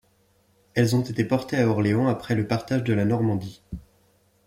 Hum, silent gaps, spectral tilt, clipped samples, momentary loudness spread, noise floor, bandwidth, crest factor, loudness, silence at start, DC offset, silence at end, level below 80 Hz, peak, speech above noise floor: none; none; -7 dB/octave; under 0.1%; 14 LU; -63 dBFS; 16 kHz; 16 dB; -24 LUFS; 0.75 s; under 0.1%; 0.65 s; -54 dBFS; -8 dBFS; 40 dB